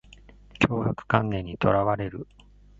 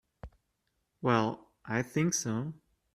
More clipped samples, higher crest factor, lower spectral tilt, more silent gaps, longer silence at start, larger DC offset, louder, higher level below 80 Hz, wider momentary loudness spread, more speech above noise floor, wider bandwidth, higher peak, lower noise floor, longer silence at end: neither; about the same, 24 dB vs 22 dB; first, -7.5 dB/octave vs -5 dB/octave; neither; first, 0.55 s vs 0.25 s; neither; first, -26 LUFS vs -32 LUFS; first, -48 dBFS vs -62 dBFS; about the same, 12 LU vs 10 LU; second, 26 dB vs 49 dB; second, 7.8 kHz vs 14 kHz; first, -2 dBFS vs -12 dBFS; second, -51 dBFS vs -80 dBFS; first, 0.55 s vs 0.4 s